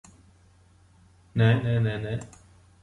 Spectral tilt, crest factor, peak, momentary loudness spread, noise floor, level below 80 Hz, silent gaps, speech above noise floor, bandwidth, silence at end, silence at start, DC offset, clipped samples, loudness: -7.5 dB/octave; 20 dB; -8 dBFS; 13 LU; -58 dBFS; -54 dBFS; none; 34 dB; 9.4 kHz; 0.55 s; 1.35 s; under 0.1%; under 0.1%; -26 LUFS